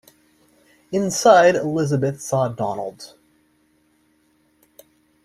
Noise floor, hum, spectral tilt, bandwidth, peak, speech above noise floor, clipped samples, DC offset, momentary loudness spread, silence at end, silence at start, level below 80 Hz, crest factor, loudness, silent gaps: -62 dBFS; none; -5 dB/octave; 15 kHz; -2 dBFS; 44 dB; under 0.1%; under 0.1%; 19 LU; 2.2 s; 0.9 s; -62 dBFS; 20 dB; -19 LUFS; none